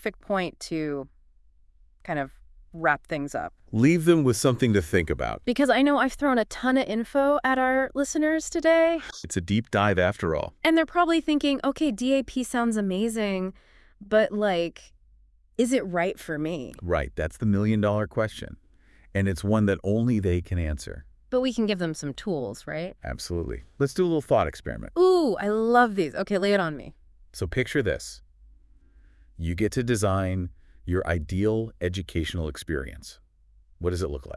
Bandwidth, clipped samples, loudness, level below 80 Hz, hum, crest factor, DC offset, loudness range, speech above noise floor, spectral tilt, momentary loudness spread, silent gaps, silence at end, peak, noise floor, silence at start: 12 kHz; under 0.1%; -25 LUFS; -46 dBFS; none; 20 dB; under 0.1%; 6 LU; 33 dB; -6 dB/octave; 12 LU; none; 0 s; -6 dBFS; -58 dBFS; 0 s